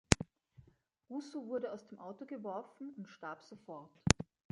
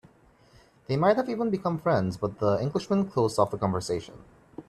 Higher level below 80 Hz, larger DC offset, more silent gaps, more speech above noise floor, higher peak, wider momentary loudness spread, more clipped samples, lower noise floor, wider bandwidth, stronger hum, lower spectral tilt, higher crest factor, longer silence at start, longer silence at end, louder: first, -52 dBFS vs -60 dBFS; neither; neither; second, 26 dB vs 32 dB; first, -4 dBFS vs -10 dBFS; first, 18 LU vs 8 LU; neither; first, -70 dBFS vs -59 dBFS; second, 11 kHz vs 13 kHz; neither; second, -4 dB/octave vs -7 dB/octave; first, 36 dB vs 18 dB; second, 0.1 s vs 0.9 s; first, 0.3 s vs 0.05 s; second, -40 LUFS vs -27 LUFS